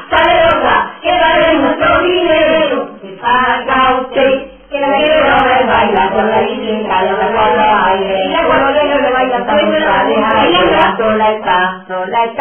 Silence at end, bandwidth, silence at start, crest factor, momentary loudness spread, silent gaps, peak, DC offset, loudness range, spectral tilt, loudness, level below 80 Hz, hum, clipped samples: 0 s; 3.6 kHz; 0 s; 10 dB; 6 LU; none; 0 dBFS; under 0.1%; 1 LU; -7.5 dB/octave; -11 LUFS; -38 dBFS; none; under 0.1%